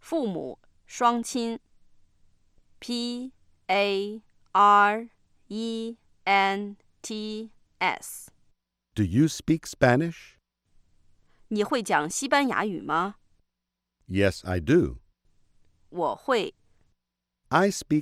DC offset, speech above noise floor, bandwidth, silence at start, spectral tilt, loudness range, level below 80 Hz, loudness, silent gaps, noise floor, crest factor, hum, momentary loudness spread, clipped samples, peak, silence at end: under 0.1%; 59 dB; 15.5 kHz; 0.05 s; -5 dB/octave; 5 LU; -54 dBFS; -26 LUFS; none; -84 dBFS; 20 dB; none; 17 LU; under 0.1%; -8 dBFS; 0 s